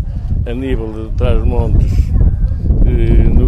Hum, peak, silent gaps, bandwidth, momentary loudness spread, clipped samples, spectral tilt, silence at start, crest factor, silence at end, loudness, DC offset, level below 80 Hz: none; 0 dBFS; none; 5.4 kHz; 7 LU; under 0.1%; -9.5 dB/octave; 0 s; 12 dB; 0 s; -15 LUFS; under 0.1%; -12 dBFS